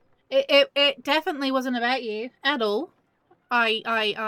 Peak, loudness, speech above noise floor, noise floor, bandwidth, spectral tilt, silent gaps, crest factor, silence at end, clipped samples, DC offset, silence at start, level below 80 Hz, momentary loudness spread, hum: -6 dBFS; -23 LUFS; 40 dB; -64 dBFS; 16.5 kHz; -3 dB/octave; none; 18 dB; 0 s; under 0.1%; under 0.1%; 0.3 s; -76 dBFS; 8 LU; none